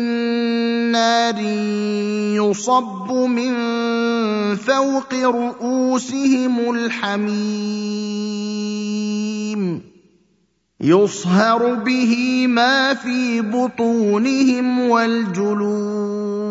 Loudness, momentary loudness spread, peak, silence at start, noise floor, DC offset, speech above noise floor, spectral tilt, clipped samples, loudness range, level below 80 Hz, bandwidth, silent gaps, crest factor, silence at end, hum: -18 LUFS; 8 LU; 0 dBFS; 0 s; -64 dBFS; under 0.1%; 46 dB; -5 dB/octave; under 0.1%; 5 LU; -68 dBFS; 7.8 kHz; none; 18 dB; 0 s; none